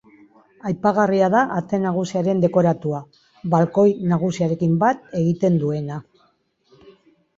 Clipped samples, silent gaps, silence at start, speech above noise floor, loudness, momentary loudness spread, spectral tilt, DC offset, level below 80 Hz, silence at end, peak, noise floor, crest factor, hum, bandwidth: under 0.1%; none; 0.65 s; 44 dB; -20 LUFS; 11 LU; -8 dB/octave; under 0.1%; -60 dBFS; 1.35 s; -4 dBFS; -63 dBFS; 18 dB; none; 7.6 kHz